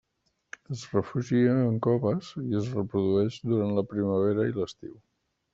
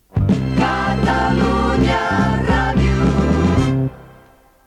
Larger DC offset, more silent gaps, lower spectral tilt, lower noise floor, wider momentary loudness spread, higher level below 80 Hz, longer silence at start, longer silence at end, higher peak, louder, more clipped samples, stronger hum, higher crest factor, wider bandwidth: neither; neither; about the same, -8 dB/octave vs -7 dB/octave; first, -76 dBFS vs -48 dBFS; first, 14 LU vs 2 LU; second, -64 dBFS vs -26 dBFS; first, 0.7 s vs 0.15 s; about the same, 0.6 s vs 0.6 s; second, -10 dBFS vs -4 dBFS; second, -27 LUFS vs -17 LUFS; neither; neither; first, 18 dB vs 12 dB; second, 7.8 kHz vs 11 kHz